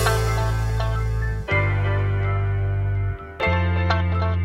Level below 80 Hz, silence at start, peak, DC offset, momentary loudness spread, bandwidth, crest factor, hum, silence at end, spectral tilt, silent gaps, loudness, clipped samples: -28 dBFS; 0 s; -6 dBFS; under 0.1%; 4 LU; 15 kHz; 16 dB; none; 0 s; -6 dB/octave; none; -23 LUFS; under 0.1%